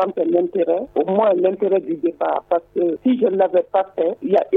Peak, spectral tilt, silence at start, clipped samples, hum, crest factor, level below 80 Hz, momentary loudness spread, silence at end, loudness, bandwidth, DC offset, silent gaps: -4 dBFS; -9 dB/octave; 0 s; under 0.1%; none; 14 dB; -62 dBFS; 5 LU; 0 s; -19 LUFS; 4 kHz; under 0.1%; none